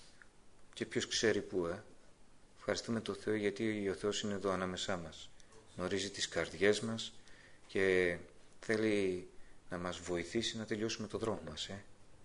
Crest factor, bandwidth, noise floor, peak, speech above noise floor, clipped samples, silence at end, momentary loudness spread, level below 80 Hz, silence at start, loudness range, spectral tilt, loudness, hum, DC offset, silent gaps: 22 dB; 10.5 kHz; -59 dBFS; -16 dBFS; 22 dB; under 0.1%; 0 s; 13 LU; -62 dBFS; 0 s; 3 LU; -4 dB/octave; -37 LUFS; none; under 0.1%; none